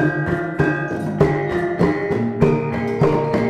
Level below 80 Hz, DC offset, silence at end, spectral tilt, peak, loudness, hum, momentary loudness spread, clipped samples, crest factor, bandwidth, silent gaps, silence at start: -40 dBFS; under 0.1%; 0 s; -8.5 dB/octave; -2 dBFS; -19 LUFS; none; 4 LU; under 0.1%; 16 dB; 10 kHz; none; 0 s